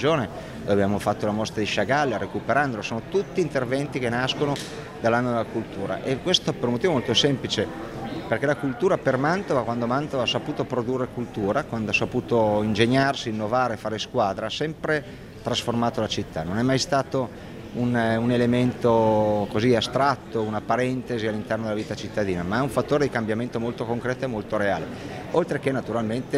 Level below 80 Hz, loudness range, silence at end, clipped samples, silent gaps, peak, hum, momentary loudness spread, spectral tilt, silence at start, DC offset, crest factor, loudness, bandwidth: -50 dBFS; 3 LU; 0 s; under 0.1%; none; -4 dBFS; none; 8 LU; -5.5 dB/octave; 0 s; under 0.1%; 20 dB; -24 LUFS; 15 kHz